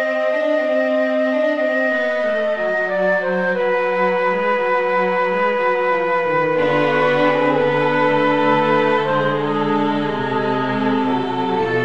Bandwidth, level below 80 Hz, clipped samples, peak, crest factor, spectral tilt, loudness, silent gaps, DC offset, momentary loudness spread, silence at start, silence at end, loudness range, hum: 7.8 kHz; -60 dBFS; under 0.1%; -4 dBFS; 14 dB; -7 dB/octave; -18 LUFS; none; 0.8%; 4 LU; 0 s; 0 s; 2 LU; none